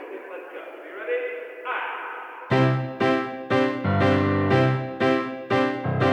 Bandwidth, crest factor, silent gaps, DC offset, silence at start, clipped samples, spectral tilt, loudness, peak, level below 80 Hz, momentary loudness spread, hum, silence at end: 8.4 kHz; 16 dB; none; under 0.1%; 0 s; under 0.1%; -7.5 dB/octave; -24 LUFS; -8 dBFS; -62 dBFS; 16 LU; none; 0 s